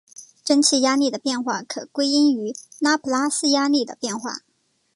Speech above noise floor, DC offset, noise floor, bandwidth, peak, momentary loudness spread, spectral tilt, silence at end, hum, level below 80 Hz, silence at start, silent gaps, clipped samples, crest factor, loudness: 47 dB; under 0.1%; -68 dBFS; 11.5 kHz; -4 dBFS; 13 LU; -2 dB/octave; 0.55 s; none; -76 dBFS; 0.2 s; none; under 0.1%; 18 dB; -21 LUFS